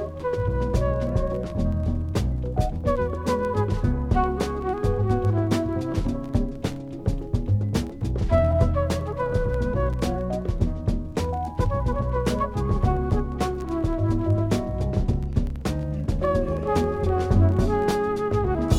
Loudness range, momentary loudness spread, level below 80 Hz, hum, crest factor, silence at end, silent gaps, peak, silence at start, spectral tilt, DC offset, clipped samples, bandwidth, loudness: 2 LU; 6 LU; -30 dBFS; none; 16 dB; 0 s; none; -6 dBFS; 0 s; -7.5 dB/octave; under 0.1%; under 0.1%; 13.5 kHz; -25 LUFS